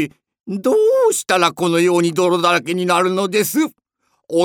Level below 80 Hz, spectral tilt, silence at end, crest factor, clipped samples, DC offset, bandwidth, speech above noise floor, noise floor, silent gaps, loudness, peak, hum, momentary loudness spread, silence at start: -68 dBFS; -4 dB/octave; 0 s; 16 dB; under 0.1%; under 0.1%; over 20 kHz; 52 dB; -67 dBFS; none; -16 LUFS; -2 dBFS; none; 8 LU; 0 s